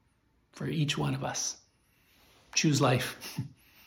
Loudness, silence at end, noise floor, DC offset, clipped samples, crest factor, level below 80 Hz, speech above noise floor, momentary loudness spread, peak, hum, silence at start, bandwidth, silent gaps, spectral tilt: -31 LUFS; 0.35 s; -70 dBFS; under 0.1%; under 0.1%; 20 dB; -64 dBFS; 40 dB; 15 LU; -12 dBFS; none; 0.55 s; 17.5 kHz; none; -4 dB/octave